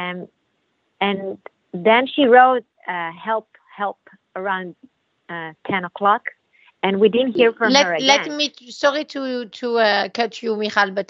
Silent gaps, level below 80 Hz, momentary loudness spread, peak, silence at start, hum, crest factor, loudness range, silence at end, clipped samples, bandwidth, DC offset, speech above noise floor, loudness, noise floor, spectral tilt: none; -72 dBFS; 16 LU; 0 dBFS; 0 s; none; 20 dB; 7 LU; 0.05 s; under 0.1%; 7.6 kHz; under 0.1%; 50 dB; -19 LUFS; -69 dBFS; -3.5 dB/octave